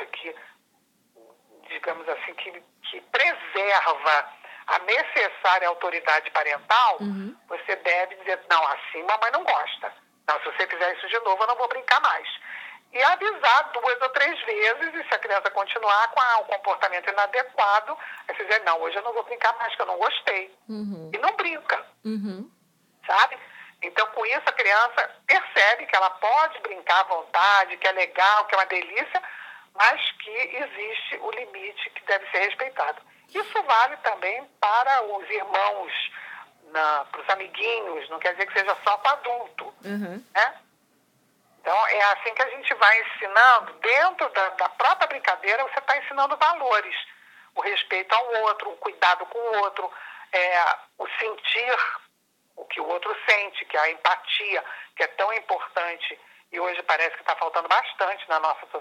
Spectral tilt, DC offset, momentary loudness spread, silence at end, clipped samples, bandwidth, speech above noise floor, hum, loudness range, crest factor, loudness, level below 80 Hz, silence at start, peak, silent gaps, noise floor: -2.5 dB/octave; under 0.1%; 14 LU; 0 s; under 0.1%; 15.5 kHz; 44 dB; none; 6 LU; 22 dB; -23 LUFS; under -90 dBFS; 0 s; -4 dBFS; none; -68 dBFS